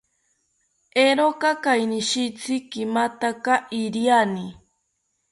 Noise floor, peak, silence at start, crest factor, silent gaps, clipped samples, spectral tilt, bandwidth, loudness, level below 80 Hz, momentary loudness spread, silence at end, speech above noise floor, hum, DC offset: -73 dBFS; -6 dBFS; 0.95 s; 18 dB; none; under 0.1%; -3.5 dB/octave; 11.5 kHz; -22 LUFS; -68 dBFS; 8 LU; 0.8 s; 52 dB; none; under 0.1%